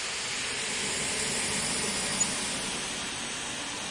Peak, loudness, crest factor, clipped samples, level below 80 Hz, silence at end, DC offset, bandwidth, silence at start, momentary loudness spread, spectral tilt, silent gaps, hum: -14 dBFS; -29 LUFS; 18 dB; under 0.1%; -56 dBFS; 0 s; under 0.1%; 11.5 kHz; 0 s; 6 LU; -1 dB/octave; none; none